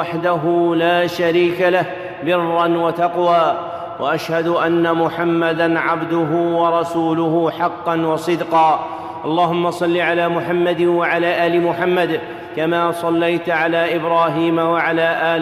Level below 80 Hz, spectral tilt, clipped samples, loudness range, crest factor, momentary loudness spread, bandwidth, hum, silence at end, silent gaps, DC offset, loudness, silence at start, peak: -60 dBFS; -6.5 dB/octave; under 0.1%; 1 LU; 14 dB; 5 LU; 14 kHz; none; 0 s; none; under 0.1%; -17 LUFS; 0 s; -4 dBFS